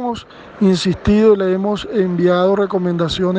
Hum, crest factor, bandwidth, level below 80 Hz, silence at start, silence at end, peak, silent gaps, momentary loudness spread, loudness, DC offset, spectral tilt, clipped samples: none; 14 dB; 9.2 kHz; -40 dBFS; 0 s; 0 s; -2 dBFS; none; 7 LU; -16 LUFS; under 0.1%; -7 dB/octave; under 0.1%